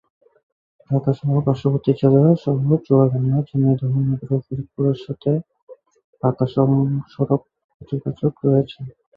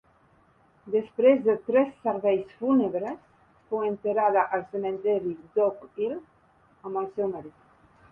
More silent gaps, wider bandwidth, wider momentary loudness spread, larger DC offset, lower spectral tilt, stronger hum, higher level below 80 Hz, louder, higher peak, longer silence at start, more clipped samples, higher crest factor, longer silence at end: first, 5.63-5.67 s, 6.04-6.13 s, 7.64-7.80 s vs none; first, 5 kHz vs 3.4 kHz; second, 8 LU vs 11 LU; neither; first, -11.5 dB/octave vs -9 dB/octave; neither; first, -56 dBFS vs -68 dBFS; first, -20 LUFS vs -26 LUFS; first, -2 dBFS vs -8 dBFS; about the same, 0.9 s vs 0.85 s; neither; about the same, 18 dB vs 18 dB; second, 0.25 s vs 0.65 s